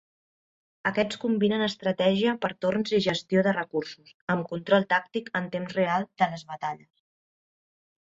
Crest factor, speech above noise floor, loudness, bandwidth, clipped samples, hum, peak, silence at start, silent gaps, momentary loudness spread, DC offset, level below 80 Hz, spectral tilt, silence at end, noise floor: 20 dB; over 64 dB; -27 LUFS; 8 kHz; under 0.1%; none; -8 dBFS; 0.85 s; 4.14-4.27 s; 10 LU; under 0.1%; -66 dBFS; -6 dB/octave; 1.35 s; under -90 dBFS